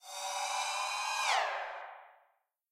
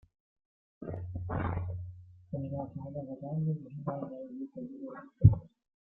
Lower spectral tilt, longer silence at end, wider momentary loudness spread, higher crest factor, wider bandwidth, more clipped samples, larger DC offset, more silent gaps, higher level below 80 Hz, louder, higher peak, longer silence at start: second, 4 dB/octave vs -12.5 dB/octave; first, 0.6 s vs 0.4 s; about the same, 16 LU vs 18 LU; second, 18 dB vs 28 dB; first, 16 kHz vs 3 kHz; neither; neither; neither; second, -84 dBFS vs -48 dBFS; about the same, -34 LUFS vs -34 LUFS; second, -18 dBFS vs -6 dBFS; second, 0.05 s vs 0.8 s